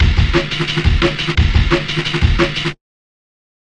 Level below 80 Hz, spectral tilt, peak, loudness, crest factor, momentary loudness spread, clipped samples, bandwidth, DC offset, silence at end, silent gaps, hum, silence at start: -20 dBFS; -5.5 dB/octave; 0 dBFS; -16 LUFS; 14 dB; 4 LU; under 0.1%; 9.8 kHz; 1%; 1 s; none; none; 0 s